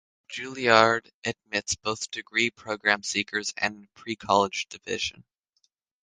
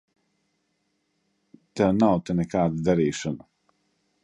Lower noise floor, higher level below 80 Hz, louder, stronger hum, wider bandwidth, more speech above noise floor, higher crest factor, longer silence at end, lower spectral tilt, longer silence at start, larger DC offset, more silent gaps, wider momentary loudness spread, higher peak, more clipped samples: about the same, -73 dBFS vs -74 dBFS; second, -62 dBFS vs -54 dBFS; about the same, -26 LUFS vs -24 LUFS; neither; about the same, 10 kHz vs 10 kHz; second, 46 dB vs 51 dB; first, 26 dB vs 20 dB; about the same, 0.8 s vs 0.85 s; second, -2.5 dB/octave vs -7 dB/octave; second, 0.3 s vs 1.75 s; neither; first, 1.14-1.22 s vs none; first, 16 LU vs 13 LU; first, -2 dBFS vs -6 dBFS; neither